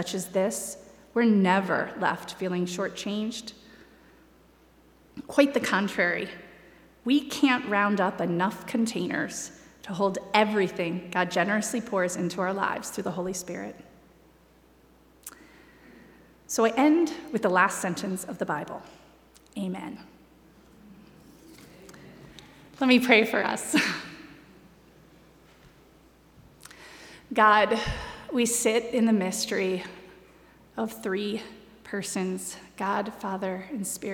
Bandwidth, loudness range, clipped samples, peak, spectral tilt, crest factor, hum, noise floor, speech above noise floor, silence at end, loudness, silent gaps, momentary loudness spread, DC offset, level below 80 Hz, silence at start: 19.5 kHz; 11 LU; under 0.1%; -4 dBFS; -4 dB/octave; 24 dB; none; -58 dBFS; 32 dB; 0 s; -26 LUFS; none; 20 LU; under 0.1%; -56 dBFS; 0 s